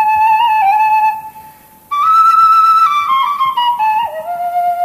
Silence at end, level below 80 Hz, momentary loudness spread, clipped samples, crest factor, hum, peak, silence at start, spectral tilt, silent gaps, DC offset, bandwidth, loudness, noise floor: 0 s; -58 dBFS; 11 LU; under 0.1%; 10 dB; none; -2 dBFS; 0 s; -1.5 dB/octave; none; under 0.1%; 15 kHz; -11 LUFS; -40 dBFS